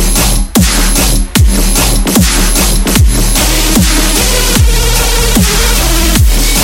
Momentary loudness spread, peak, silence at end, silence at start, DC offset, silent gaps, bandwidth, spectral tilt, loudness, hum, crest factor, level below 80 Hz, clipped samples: 1 LU; 0 dBFS; 0 s; 0 s; under 0.1%; none; 17 kHz; -3.5 dB/octave; -9 LUFS; none; 8 dB; -10 dBFS; 0.2%